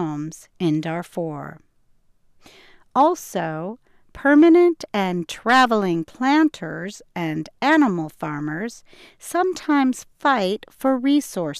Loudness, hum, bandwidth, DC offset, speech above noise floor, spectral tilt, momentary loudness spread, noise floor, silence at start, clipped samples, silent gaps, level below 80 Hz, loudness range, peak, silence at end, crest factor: -20 LUFS; none; 14.5 kHz; under 0.1%; 37 dB; -5.5 dB/octave; 15 LU; -58 dBFS; 0 s; under 0.1%; none; -60 dBFS; 7 LU; -6 dBFS; 0 s; 14 dB